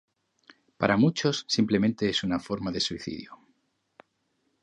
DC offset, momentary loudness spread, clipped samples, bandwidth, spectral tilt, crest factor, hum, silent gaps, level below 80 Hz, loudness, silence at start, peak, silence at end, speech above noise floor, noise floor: under 0.1%; 14 LU; under 0.1%; 9.4 kHz; -5 dB/octave; 22 dB; none; none; -58 dBFS; -27 LUFS; 0.8 s; -6 dBFS; 1.25 s; 48 dB; -75 dBFS